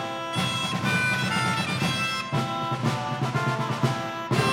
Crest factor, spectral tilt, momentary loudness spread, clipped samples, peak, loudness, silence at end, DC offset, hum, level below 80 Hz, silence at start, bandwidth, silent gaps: 16 dB; -4.5 dB/octave; 4 LU; under 0.1%; -10 dBFS; -26 LUFS; 0 s; under 0.1%; none; -58 dBFS; 0 s; 17.5 kHz; none